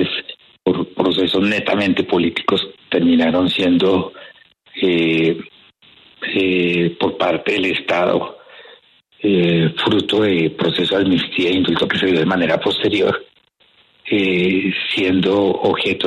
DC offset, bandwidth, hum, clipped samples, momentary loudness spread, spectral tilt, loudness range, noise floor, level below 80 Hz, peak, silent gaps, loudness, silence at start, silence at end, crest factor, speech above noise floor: under 0.1%; 11.5 kHz; none; under 0.1%; 6 LU; -6.5 dB/octave; 3 LU; -55 dBFS; -54 dBFS; -2 dBFS; none; -17 LUFS; 0 s; 0 s; 14 dB; 39 dB